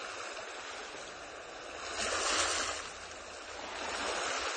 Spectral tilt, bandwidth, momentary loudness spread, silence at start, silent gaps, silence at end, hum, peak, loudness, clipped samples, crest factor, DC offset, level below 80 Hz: -0.5 dB/octave; 9.8 kHz; 14 LU; 0 s; none; 0 s; none; -16 dBFS; -36 LUFS; under 0.1%; 22 dB; under 0.1%; -62 dBFS